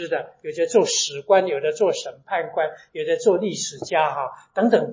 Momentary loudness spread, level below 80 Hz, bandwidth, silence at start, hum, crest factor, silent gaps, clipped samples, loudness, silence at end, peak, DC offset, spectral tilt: 10 LU; -74 dBFS; 7.6 kHz; 0 s; none; 18 dB; none; under 0.1%; -22 LUFS; 0 s; -4 dBFS; under 0.1%; -3 dB/octave